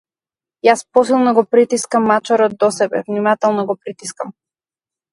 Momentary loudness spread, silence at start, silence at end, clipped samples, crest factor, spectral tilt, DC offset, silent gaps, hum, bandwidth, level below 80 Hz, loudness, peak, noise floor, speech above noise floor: 14 LU; 0.65 s; 0.8 s; under 0.1%; 16 dB; -4.5 dB/octave; under 0.1%; none; none; 11.5 kHz; -66 dBFS; -15 LUFS; 0 dBFS; under -90 dBFS; over 75 dB